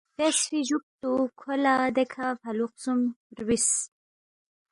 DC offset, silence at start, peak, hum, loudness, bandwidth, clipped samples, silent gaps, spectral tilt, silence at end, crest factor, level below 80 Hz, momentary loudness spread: under 0.1%; 0.2 s; -10 dBFS; none; -27 LUFS; 11.5 kHz; under 0.1%; 0.83-0.99 s, 3.16-3.30 s; -2.5 dB/octave; 0.85 s; 18 dB; -64 dBFS; 8 LU